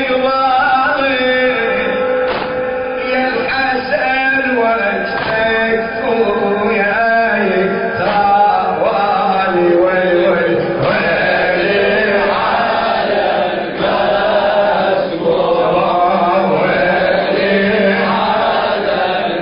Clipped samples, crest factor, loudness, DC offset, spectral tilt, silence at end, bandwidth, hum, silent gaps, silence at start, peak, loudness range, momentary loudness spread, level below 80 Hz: under 0.1%; 12 dB; -13 LUFS; under 0.1%; -10.5 dB/octave; 0 s; 5.4 kHz; none; none; 0 s; -2 dBFS; 2 LU; 4 LU; -44 dBFS